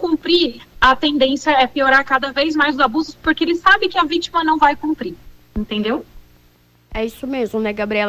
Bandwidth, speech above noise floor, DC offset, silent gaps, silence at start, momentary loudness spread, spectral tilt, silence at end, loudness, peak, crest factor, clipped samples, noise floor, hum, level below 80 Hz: 16 kHz; 36 dB; under 0.1%; none; 0 s; 12 LU; -4 dB/octave; 0 s; -17 LUFS; -2 dBFS; 16 dB; under 0.1%; -53 dBFS; 60 Hz at -50 dBFS; -42 dBFS